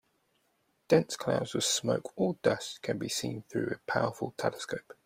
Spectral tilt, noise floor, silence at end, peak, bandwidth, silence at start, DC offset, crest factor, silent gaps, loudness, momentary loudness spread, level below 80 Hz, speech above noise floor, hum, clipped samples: -4 dB/octave; -74 dBFS; 0.15 s; -10 dBFS; 16 kHz; 0.9 s; under 0.1%; 22 dB; none; -31 LUFS; 8 LU; -68 dBFS; 43 dB; none; under 0.1%